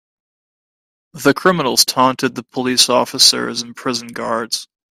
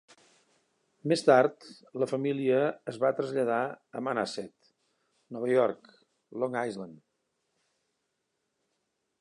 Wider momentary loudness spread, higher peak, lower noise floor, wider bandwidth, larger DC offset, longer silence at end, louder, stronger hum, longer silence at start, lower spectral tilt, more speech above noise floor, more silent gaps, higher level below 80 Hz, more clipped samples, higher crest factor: second, 12 LU vs 20 LU; first, 0 dBFS vs -8 dBFS; first, under -90 dBFS vs -81 dBFS; first, 16 kHz vs 11 kHz; neither; second, 0.3 s vs 2.25 s; first, -15 LUFS vs -29 LUFS; neither; about the same, 1.15 s vs 1.05 s; second, -2 dB/octave vs -6 dB/octave; first, over 74 dB vs 52 dB; neither; first, -60 dBFS vs -82 dBFS; neither; second, 18 dB vs 24 dB